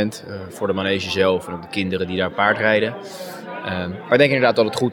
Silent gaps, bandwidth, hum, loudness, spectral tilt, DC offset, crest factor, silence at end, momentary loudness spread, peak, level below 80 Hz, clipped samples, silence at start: none; 18.5 kHz; none; -20 LUFS; -5.5 dB/octave; under 0.1%; 18 dB; 0 s; 16 LU; -2 dBFS; -64 dBFS; under 0.1%; 0 s